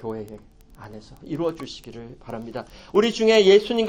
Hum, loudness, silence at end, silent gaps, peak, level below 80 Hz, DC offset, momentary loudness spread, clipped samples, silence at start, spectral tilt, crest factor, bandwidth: none; -19 LUFS; 0 s; none; -4 dBFS; -52 dBFS; under 0.1%; 26 LU; under 0.1%; 0 s; -4.5 dB/octave; 18 dB; 9.8 kHz